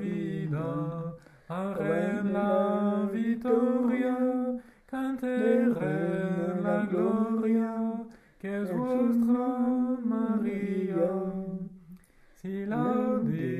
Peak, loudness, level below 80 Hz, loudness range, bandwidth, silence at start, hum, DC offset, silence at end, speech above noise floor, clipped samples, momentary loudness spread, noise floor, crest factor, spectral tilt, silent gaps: -14 dBFS; -29 LUFS; -64 dBFS; 3 LU; 12 kHz; 0 s; none; under 0.1%; 0 s; 28 dB; under 0.1%; 11 LU; -56 dBFS; 16 dB; -9 dB/octave; none